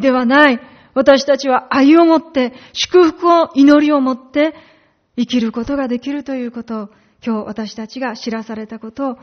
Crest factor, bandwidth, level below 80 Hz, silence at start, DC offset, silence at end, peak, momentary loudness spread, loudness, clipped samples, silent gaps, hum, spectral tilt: 14 dB; 6.6 kHz; -52 dBFS; 0 s; under 0.1%; 0.05 s; 0 dBFS; 16 LU; -14 LUFS; under 0.1%; none; none; -2.5 dB/octave